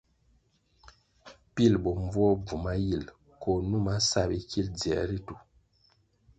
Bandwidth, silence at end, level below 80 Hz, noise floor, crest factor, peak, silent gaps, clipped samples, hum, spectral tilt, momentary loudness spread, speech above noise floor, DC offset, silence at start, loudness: 9.2 kHz; 1 s; -46 dBFS; -68 dBFS; 20 dB; -10 dBFS; none; under 0.1%; none; -5.5 dB/octave; 13 LU; 40 dB; under 0.1%; 1.25 s; -29 LUFS